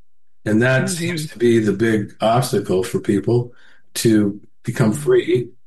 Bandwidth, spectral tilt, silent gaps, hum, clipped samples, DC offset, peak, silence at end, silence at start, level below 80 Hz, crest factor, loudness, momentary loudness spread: 12.5 kHz; -6 dB/octave; none; none; under 0.1%; 0.9%; -4 dBFS; 0.2 s; 0.45 s; -54 dBFS; 14 dB; -18 LUFS; 8 LU